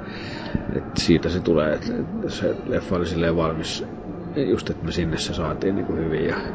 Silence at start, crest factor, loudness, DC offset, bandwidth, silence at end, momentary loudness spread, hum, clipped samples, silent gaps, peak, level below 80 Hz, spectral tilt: 0 s; 20 dB; -24 LUFS; under 0.1%; 8 kHz; 0 s; 9 LU; none; under 0.1%; none; -4 dBFS; -38 dBFS; -6 dB/octave